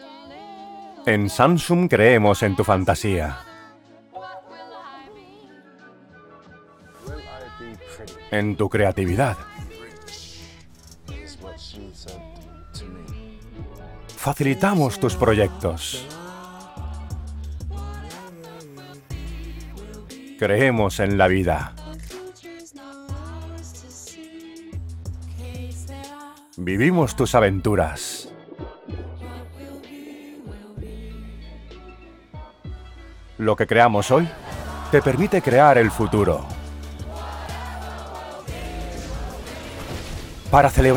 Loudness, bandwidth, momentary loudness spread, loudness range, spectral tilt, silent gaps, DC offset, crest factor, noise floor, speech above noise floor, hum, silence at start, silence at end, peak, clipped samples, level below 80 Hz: -21 LUFS; 19.5 kHz; 23 LU; 20 LU; -6 dB/octave; none; under 0.1%; 22 dB; -49 dBFS; 31 dB; none; 0 s; 0 s; -2 dBFS; under 0.1%; -38 dBFS